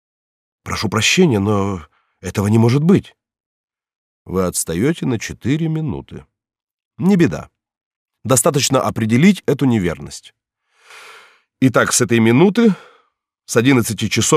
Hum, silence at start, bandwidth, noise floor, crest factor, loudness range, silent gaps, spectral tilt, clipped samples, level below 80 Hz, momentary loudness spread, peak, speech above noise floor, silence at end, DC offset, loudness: none; 0.65 s; 15.5 kHz; -63 dBFS; 16 dB; 5 LU; 3.40-3.68 s, 3.96-4.25 s, 6.73-6.79 s, 6.85-6.91 s, 7.77-8.06 s; -5 dB/octave; under 0.1%; -48 dBFS; 15 LU; -2 dBFS; 48 dB; 0 s; under 0.1%; -16 LUFS